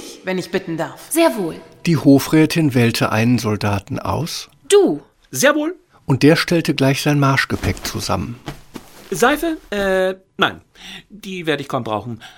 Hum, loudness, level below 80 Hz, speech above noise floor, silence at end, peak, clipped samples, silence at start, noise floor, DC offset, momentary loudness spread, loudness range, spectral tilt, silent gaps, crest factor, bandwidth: none; -18 LUFS; -44 dBFS; 21 dB; 0.1 s; 0 dBFS; under 0.1%; 0 s; -38 dBFS; under 0.1%; 15 LU; 5 LU; -5 dB/octave; none; 18 dB; 17 kHz